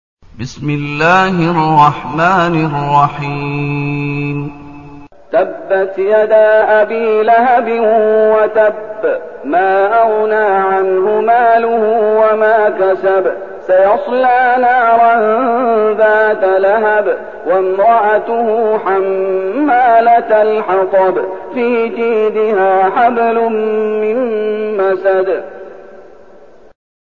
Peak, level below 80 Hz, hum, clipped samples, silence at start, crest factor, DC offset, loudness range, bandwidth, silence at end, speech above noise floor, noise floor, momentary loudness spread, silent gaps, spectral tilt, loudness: 0 dBFS; -48 dBFS; none; under 0.1%; 0.4 s; 12 dB; 0.9%; 4 LU; 7.2 kHz; 1.15 s; 30 dB; -41 dBFS; 8 LU; none; -7.5 dB/octave; -12 LUFS